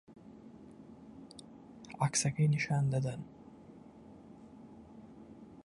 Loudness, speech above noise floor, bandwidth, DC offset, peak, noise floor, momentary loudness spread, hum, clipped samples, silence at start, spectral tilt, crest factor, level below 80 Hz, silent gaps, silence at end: -33 LUFS; 23 dB; 11.5 kHz; under 0.1%; -18 dBFS; -55 dBFS; 24 LU; none; under 0.1%; 0.1 s; -5 dB/octave; 20 dB; -68 dBFS; none; 0.05 s